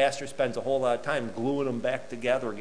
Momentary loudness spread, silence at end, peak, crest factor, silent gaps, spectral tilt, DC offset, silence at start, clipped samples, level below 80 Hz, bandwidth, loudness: 4 LU; 0 s; -12 dBFS; 18 dB; none; -5 dB/octave; 0.8%; 0 s; under 0.1%; -60 dBFS; 11 kHz; -29 LUFS